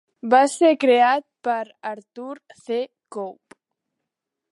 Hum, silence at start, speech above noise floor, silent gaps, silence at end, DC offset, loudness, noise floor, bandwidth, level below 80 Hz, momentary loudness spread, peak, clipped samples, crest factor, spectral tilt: none; 0.25 s; 63 dB; none; 1.2 s; under 0.1%; -19 LUFS; -83 dBFS; 11.5 kHz; -82 dBFS; 20 LU; -4 dBFS; under 0.1%; 20 dB; -3 dB/octave